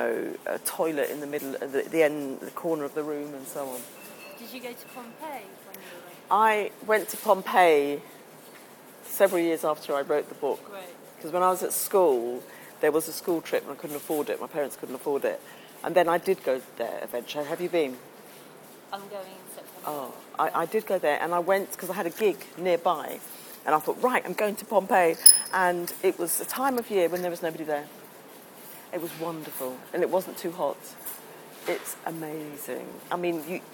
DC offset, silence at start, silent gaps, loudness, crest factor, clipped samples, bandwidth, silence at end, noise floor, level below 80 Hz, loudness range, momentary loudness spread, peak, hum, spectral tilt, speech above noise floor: under 0.1%; 0 s; none; -27 LUFS; 28 dB; under 0.1%; 19 kHz; 0 s; -49 dBFS; -74 dBFS; 12 LU; 20 LU; 0 dBFS; none; -2.5 dB/octave; 21 dB